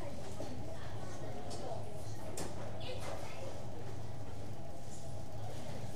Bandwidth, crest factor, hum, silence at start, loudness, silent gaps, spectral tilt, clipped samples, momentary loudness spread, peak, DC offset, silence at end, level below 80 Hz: 15.5 kHz; 18 dB; none; 0 s; -46 LUFS; none; -5.5 dB/octave; under 0.1%; 4 LU; -24 dBFS; 2%; 0 s; -56 dBFS